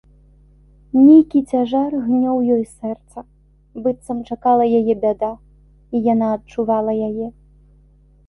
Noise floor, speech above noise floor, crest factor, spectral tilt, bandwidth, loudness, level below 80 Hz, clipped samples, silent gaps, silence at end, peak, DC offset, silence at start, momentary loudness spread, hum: -51 dBFS; 34 dB; 16 dB; -8.5 dB/octave; 11.5 kHz; -17 LUFS; -50 dBFS; under 0.1%; none; 1 s; -2 dBFS; under 0.1%; 0.95 s; 16 LU; 50 Hz at -50 dBFS